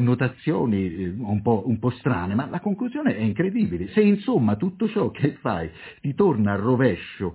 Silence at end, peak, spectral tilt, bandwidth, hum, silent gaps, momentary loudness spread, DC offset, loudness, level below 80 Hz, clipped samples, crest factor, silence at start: 0 s; -6 dBFS; -12 dB/octave; 4 kHz; none; none; 7 LU; under 0.1%; -23 LUFS; -48 dBFS; under 0.1%; 18 dB; 0 s